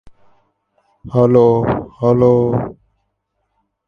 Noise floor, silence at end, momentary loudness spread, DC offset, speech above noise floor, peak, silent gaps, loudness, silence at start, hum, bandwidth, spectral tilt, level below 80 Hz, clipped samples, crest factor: -70 dBFS; 1.15 s; 10 LU; under 0.1%; 57 dB; 0 dBFS; none; -14 LUFS; 1.05 s; none; 6.4 kHz; -10.5 dB/octave; -44 dBFS; under 0.1%; 16 dB